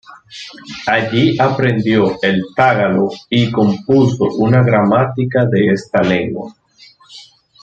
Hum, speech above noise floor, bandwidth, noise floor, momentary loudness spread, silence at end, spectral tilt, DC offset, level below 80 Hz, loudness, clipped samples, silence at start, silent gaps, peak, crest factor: none; 32 dB; 7.8 kHz; -46 dBFS; 13 LU; 0.4 s; -7.5 dB/octave; under 0.1%; -50 dBFS; -14 LUFS; under 0.1%; 0.1 s; none; 0 dBFS; 14 dB